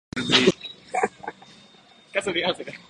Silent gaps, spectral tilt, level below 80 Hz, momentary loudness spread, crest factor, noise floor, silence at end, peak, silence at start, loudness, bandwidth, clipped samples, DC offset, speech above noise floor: none; -3.5 dB/octave; -58 dBFS; 17 LU; 24 dB; -53 dBFS; 0.1 s; -2 dBFS; 0.15 s; -23 LUFS; 11.5 kHz; under 0.1%; under 0.1%; 30 dB